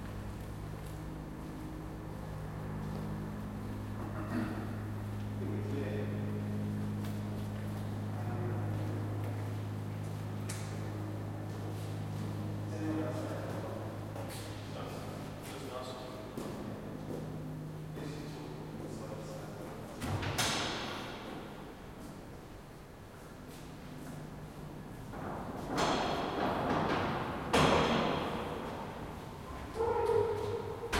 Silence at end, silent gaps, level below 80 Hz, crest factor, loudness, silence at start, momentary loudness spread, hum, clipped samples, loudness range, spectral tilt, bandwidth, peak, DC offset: 0 s; none; -54 dBFS; 22 dB; -38 LUFS; 0 s; 14 LU; none; under 0.1%; 10 LU; -5.5 dB/octave; 16.5 kHz; -16 dBFS; under 0.1%